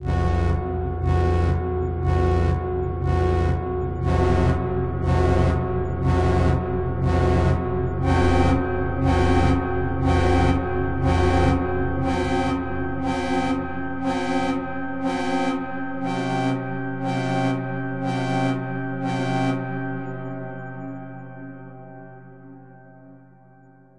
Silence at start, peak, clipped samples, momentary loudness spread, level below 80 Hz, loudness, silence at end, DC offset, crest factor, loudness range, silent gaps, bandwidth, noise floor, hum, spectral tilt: 0 s; -6 dBFS; under 0.1%; 10 LU; -34 dBFS; -23 LUFS; 0.8 s; under 0.1%; 16 dB; 8 LU; none; 10.5 kHz; -51 dBFS; none; -7.5 dB/octave